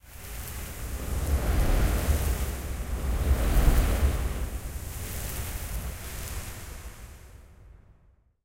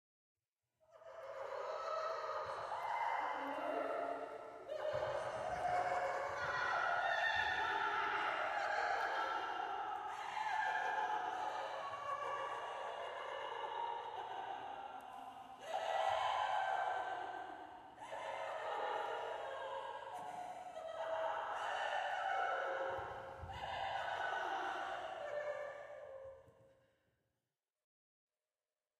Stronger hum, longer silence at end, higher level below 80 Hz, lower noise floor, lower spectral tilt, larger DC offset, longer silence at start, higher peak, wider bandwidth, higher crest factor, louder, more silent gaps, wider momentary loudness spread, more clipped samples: neither; second, 0.7 s vs 2.3 s; first, -30 dBFS vs -74 dBFS; second, -61 dBFS vs under -90 dBFS; first, -5 dB/octave vs -3 dB/octave; neither; second, 0.05 s vs 0.9 s; first, -8 dBFS vs -26 dBFS; first, 17 kHz vs 13.5 kHz; about the same, 20 dB vs 16 dB; first, -30 LUFS vs -41 LUFS; neither; first, 16 LU vs 12 LU; neither